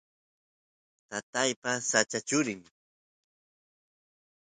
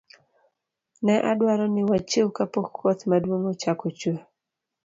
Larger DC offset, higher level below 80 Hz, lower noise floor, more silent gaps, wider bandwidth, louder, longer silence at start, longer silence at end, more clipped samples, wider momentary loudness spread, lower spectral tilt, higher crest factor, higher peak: neither; second, -76 dBFS vs -64 dBFS; first, under -90 dBFS vs -85 dBFS; first, 1.23-1.33 s, 1.56-1.62 s vs none; first, 9.4 kHz vs 7.8 kHz; second, -29 LUFS vs -24 LUFS; about the same, 1.1 s vs 1 s; first, 1.8 s vs 0.65 s; neither; first, 13 LU vs 6 LU; second, -2 dB/octave vs -6 dB/octave; first, 26 dB vs 16 dB; about the same, -10 dBFS vs -8 dBFS